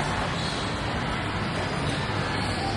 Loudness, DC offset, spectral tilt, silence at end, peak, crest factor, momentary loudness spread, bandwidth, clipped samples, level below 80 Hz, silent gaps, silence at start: -28 LUFS; under 0.1%; -5 dB/octave; 0 s; -14 dBFS; 12 dB; 1 LU; 11.5 kHz; under 0.1%; -40 dBFS; none; 0 s